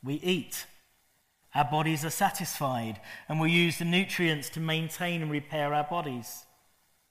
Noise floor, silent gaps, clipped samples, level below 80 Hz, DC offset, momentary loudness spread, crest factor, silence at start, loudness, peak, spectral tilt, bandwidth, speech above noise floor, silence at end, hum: -70 dBFS; none; under 0.1%; -66 dBFS; under 0.1%; 13 LU; 20 dB; 0.05 s; -29 LUFS; -12 dBFS; -4.5 dB/octave; 15.5 kHz; 40 dB; 0.7 s; none